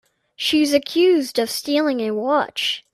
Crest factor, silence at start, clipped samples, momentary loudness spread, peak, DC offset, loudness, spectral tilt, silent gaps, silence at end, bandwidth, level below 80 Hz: 16 dB; 0.4 s; under 0.1%; 6 LU; -4 dBFS; under 0.1%; -19 LUFS; -3 dB/octave; none; 0.15 s; 15.5 kHz; -62 dBFS